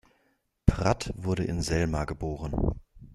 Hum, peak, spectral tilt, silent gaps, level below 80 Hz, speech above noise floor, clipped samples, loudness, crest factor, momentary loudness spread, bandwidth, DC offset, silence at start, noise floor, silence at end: none; -2 dBFS; -6.5 dB/octave; none; -36 dBFS; 43 dB; under 0.1%; -29 LUFS; 26 dB; 7 LU; 12.5 kHz; under 0.1%; 0.65 s; -72 dBFS; 0 s